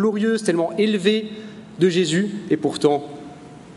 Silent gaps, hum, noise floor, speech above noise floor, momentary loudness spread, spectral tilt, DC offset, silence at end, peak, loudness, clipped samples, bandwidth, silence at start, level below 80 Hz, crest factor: none; none; -40 dBFS; 20 dB; 19 LU; -5.5 dB/octave; under 0.1%; 0 s; -4 dBFS; -20 LUFS; under 0.1%; 11.5 kHz; 0 s; -64 dBFS; 18 dB